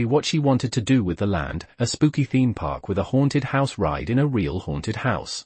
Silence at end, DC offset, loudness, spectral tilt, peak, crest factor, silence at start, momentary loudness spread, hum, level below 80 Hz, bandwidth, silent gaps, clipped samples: 0.05 s; under 0.1%; -23 LUFS; -6 dB/octave; -6 dBFS; 16 dB; 0 s; 6 LU; none; -44 dBFS; 8.8 kHz; none; under 0.1%